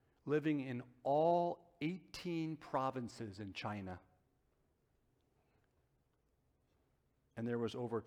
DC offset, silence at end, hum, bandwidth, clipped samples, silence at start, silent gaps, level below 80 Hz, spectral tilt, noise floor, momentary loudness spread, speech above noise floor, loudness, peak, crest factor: under 0.1%; 0 s; none; 13 kHz; under 0.1%; 0.25 s; none; -76 dBFS; -7 dB/octave; -79 dBFS; 13 LU; 39 dB; -40 LUFS; -24 dBFS; 18 dB